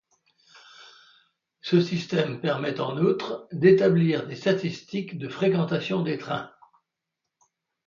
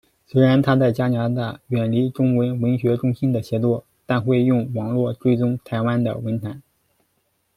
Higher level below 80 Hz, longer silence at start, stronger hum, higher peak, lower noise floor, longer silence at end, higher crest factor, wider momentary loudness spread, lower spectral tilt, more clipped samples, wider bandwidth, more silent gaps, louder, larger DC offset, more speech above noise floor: second, -70 dBFS vs -56 dBFS; first, 0.8 s vs 0.35 s; neither; about the same, -6 dBFS vs -4 dBFS; first, -84 dBFS vs -68 dBFS; first, 1.4 s vs 0.95 s; about the same, 20 dB vs 16 dB; first, 13 LU vs 9 LU; second, -7.5 dB/octave vs -9 dB/octave; neither; second, 7.2 kHz vs 12.5 kHz; neither; second, -25 LUFS vs -21 LUFS; neither; first, 60 dB vs 49 dB